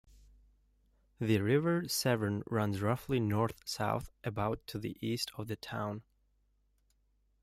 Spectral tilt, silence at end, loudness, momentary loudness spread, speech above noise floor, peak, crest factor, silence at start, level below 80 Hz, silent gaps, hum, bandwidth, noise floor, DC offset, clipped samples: -5.5 dB/octave; 1.4 s; -34 LUFS; 10 LU; 40 dB; -18 dBFS; 18 dB; 1.2 s; -62 dBFS; none; 50 Hz at -55 dBFS; 16 kHz; -74 dBFS; under 0.1%; under 0.1%